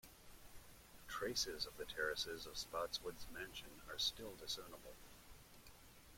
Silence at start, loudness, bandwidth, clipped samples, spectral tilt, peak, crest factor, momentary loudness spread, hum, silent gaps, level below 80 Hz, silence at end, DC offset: 0.05 s; -45 LUFS; 16.5 kHz; under 0.1%; -1.5 dB/octave; -28 dBFS; 22 dB; 20 LU; none; none; -64 dBFS; 0 s; under 0.1%